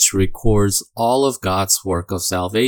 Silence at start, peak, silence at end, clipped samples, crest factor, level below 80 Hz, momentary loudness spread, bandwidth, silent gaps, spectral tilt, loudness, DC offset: 0 s; -2 dBFS; 0 s; under 0.1%; 16 dB; -32 dBFS; 4 LU; 18 kHz; none; -4 dB/octave; -18 LUFS; under 0.1%